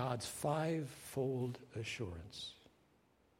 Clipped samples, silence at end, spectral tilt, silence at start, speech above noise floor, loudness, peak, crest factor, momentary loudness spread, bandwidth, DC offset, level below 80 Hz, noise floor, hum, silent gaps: under 0.1%; 0.8 s; -5.5 dB/octave; 0 s; 31 dB; -42 LUFS; -24 dBFS; 18 dB; 10 LU; 16 kHz; under 0.1%; -68 dBFS; -73 dBFS; none; none